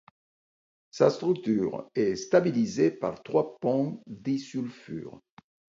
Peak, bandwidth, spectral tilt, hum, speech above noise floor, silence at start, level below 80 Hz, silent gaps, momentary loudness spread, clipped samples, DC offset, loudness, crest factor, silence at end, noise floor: -6 dBFS; 7.8 kHz; -6.5 dB/octave; none; over 63 dB; 0.95 s; -68 dBFS; none; 14 LU; under 0.1%; under 0.1%; -28 LUFS; 22 dB; 0.7 s; under -90 dBFS